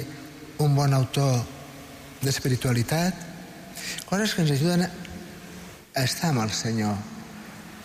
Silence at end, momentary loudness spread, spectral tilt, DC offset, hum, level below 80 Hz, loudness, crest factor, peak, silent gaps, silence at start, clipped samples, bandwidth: 0 s; 19 LU; -5 dB/octave; under 0.1%; none; -54 dBFS; -25 LUFS; 14 dB; -14 dBFS; none; 0 s; under 0.1%; 15.5 kHz